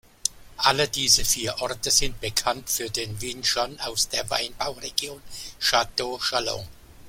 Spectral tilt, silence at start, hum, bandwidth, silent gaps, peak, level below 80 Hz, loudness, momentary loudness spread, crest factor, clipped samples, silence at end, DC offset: -1 dB/octave; 0.25 s; none; 16.5 kHz; none; 0 dBFS; -44 dBFS; -24 LUFS; 11 LU; 26 dB; under 0.1%; 0 s; under 0.1%